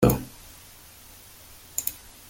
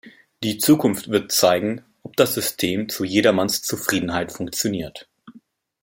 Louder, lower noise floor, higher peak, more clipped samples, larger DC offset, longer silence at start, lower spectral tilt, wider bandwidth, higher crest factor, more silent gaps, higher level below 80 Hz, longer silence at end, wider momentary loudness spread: second, -29 LUFS vs -21 LUFS; about the same, -49 dBFS vs -52 dBFS; second, -6 dBFS vs 0 dBFS; neither; neither; about the same, 0 s vs 0.05 s; first, -5.5 dB/octave vs -3.5 dB/octave; about the same, 17 kHz vs 17 kHz; about the same, 24 dB vs 22 dB; neither; first, -44 dBFS vs -58 dBFS; about the same, 0.35 s vs 0.45 s; first, 17 LU vs 11 LU